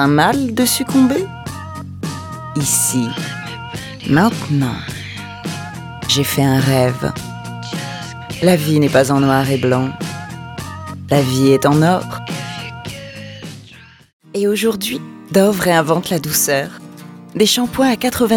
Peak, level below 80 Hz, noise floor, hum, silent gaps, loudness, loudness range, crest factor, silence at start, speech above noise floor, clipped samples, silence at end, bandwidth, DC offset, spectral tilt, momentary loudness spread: -2 dBFS; -46 dBFS; -42 dBFS; none; 14.13-14.20 s; -16 LUFS; 4 LU; 16 dB; 0 s; 27 dB; under 0.1%; 0 s; 19 kHz; under 0.1%; -4.5 dB/octave; 16 LU